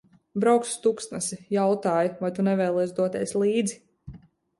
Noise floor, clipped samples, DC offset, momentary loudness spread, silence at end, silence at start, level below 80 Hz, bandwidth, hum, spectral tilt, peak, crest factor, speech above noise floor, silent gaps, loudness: -48 dBFS; under 0.1%; under 0.1%; 8 LU; 0.4 s; 0.35 s; -62 dBFS; 11.5 kHz; none; -5.5 dB/octave; -8 dBFS; 18 dB; 24 dB; none; -25 LUFS